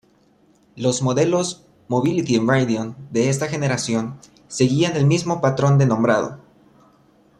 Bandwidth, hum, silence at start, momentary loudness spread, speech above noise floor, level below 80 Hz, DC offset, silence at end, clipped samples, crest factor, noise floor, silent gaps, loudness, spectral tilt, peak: 11 kHz; none; 0.75 s; 9 LU; 38 dB; -58 dBFS; under 0.1%; 1 s; under 0.1%; 16 dB; -57 dBFS; none; -20 LUFS; -6 dB/octave; -4 dBFS